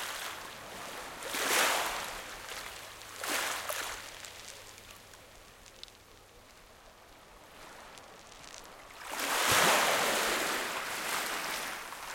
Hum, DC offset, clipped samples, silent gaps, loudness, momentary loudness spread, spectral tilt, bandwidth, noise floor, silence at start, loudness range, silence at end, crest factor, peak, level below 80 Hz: none; under 0.1%; under 0.1%; none; -32 LUFS; 24 LU; -0.5 dB/octave; 17 kHz; -56 dBFS; 0 s; 22 LU; 0 s; 24 dB; -12 dBFS; -64 dBFS